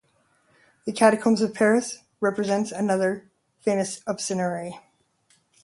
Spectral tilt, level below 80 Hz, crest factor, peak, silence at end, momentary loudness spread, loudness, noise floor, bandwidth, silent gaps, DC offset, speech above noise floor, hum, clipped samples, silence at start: -5 dB/octave; -70 dBFS; 22 dB; -4 dBFS; 0.85 s; 14 LU; -24 LUFS; -65 dBFS; 11.5 kHz; none; under 0.1%; 42 dB; none; under 0.1%; 0.85 s